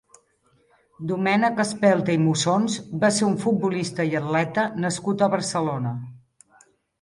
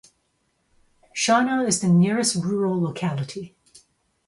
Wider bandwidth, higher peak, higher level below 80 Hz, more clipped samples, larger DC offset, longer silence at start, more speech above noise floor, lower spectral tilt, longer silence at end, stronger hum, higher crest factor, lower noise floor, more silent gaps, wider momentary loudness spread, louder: about the same, 11.5 kHz vs 11.5 kHz; about the same, -6 dBFS vs -6 dBFS; about the same, -64 dBFS vs -62 dBFS; neither; neither; second, 1 s vs 1.15 s; second, 41 dB vs 49 dB; about the same, -5 dB/octave vs -4.5 dB/octave; about the same, 0.85 s vs 0.8 s; neither; about the same, 18 dB vs 18 dB; second, -64 dBFS vs -70 dBFS; neither; second, 8 LU vs 15 LU; about the same, -23 LUFS vs -22 LUFS